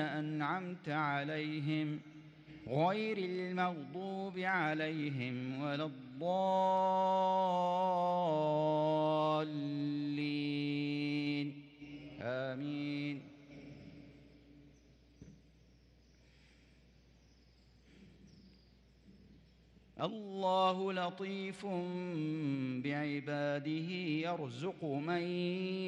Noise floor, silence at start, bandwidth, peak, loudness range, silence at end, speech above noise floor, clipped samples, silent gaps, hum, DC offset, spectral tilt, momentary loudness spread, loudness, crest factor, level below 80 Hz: -65 dBFS; 0 s; 9.8 kHz; -20 dBFS; 11 LU; 0 s; 29 dB; under 0.1%; none; none; under 0.1%; -7 dB/octave; 12 LU; -37 LUFS; 18 dB; -74 dBFS